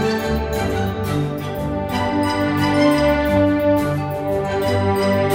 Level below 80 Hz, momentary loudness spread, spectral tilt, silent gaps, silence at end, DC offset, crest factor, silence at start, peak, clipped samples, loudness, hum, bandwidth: -34 dBFS; 7 LU; -6.5 dB/octave; none; 0 s; under 0.1%; 14 dB; 0 s; -4 dBFS; under 0.1%; -19 LUFS; none; 16.5 kHz